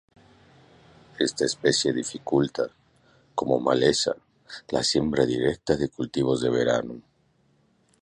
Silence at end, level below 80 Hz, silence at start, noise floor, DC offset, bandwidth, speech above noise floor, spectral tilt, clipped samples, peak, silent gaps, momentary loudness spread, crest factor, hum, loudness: 1 s; -54 dBFS; 1.2 s; -65 dBFS; under 0.1%; 11.5 kHz; 41 dB; -4 dB/octave; under 0.1%; -6 dBFS; none; 11 LU; 20 dB; none; -25 LUFS